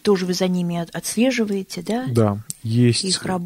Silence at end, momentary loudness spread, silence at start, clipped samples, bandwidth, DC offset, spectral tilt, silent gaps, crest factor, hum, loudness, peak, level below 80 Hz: 0 s; 8 LU; 0.05 s; under 0.1%; 16 kHz; under 0.1%; -5 dB/octave; none; 16 dB; none; -21 LUFS; -4 dBFS; -56 dBFS